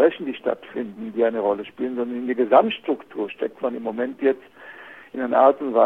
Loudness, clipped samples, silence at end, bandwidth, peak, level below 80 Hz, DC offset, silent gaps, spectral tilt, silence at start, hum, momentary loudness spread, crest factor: -23 LUFS; under 0.1%; 0 s; 4.1 kHz; -2 dBFS; -68 dBFS; under 0.1%; none; -7.5 dB/octave; 0 s; none; 14 LU; 20 dB